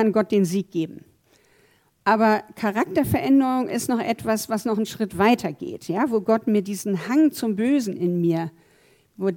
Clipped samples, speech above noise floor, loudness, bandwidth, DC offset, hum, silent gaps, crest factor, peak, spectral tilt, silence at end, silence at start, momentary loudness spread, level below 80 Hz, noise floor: under 0.1%; 39 dB; -22 LUFS; 18 kHz; under 0.1%; none; none; 18 dB; -6 dBFS; -6 dB/octave; 0 s; 0 s; 9 LU; -58 dBFS; -60 dBFS